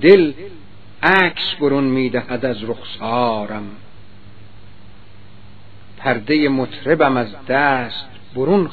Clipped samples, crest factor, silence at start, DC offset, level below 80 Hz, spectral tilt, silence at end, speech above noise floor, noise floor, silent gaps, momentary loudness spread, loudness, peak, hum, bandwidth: under 0.1%; 18 dB; 0 s; 2%; -52 dBFS; -8.5 dB/octave; 0 s; 28 dB; -44 dBFS; none; 15 LU; -17 LUFS; 0 dBFS; none; 5.4 kHz